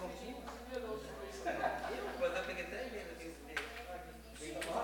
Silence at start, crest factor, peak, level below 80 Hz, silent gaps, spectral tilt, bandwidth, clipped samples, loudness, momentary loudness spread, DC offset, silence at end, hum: 0 s; 20 dB; -22 dBFS; -58 dBFS; none; -3.5 dB/octave; 17 kHz; under 0.1%; -43 LUFS; 10 LU; under 0.1%; 0 s; none